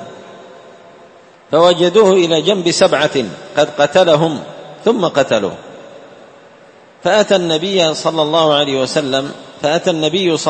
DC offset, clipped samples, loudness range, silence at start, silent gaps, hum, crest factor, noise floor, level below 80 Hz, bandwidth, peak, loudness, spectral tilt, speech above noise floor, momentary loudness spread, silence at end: under 0.1%; under 0.1%; 4 LU; 0 s; none; none; 14 dB; -43 dBFS; -58 dBFS; 8.8 kHz; 0 dBFS; -13 LUFS; -4 dB/octave; 30 dB; 10 LU; 0 s